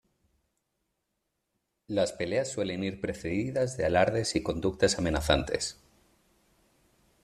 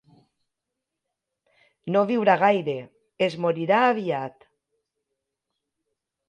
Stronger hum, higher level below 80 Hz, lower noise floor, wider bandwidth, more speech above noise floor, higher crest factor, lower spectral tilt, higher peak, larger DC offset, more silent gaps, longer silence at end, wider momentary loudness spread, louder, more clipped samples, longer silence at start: neither; first, -48 dBFS vs -76 dBFS; about the same, -81 dBFS vs -84 dBFS; first, 13.5 kHz vs 9.2 kHz; second, 53 dB vs 62 dB; about the same, 22 dB vs 20 dB; second, -4.5 dB/octave vs -7 dB/octave; about the same, -8 dBFS vs -6 dBFS; neither; neither; second, 1.5 s vs 2 s; second, 7 LU vs 13 LU; second, -29 LUFS vs -23 LUFS; neither; about the same, 1.9 s vs 1.85 s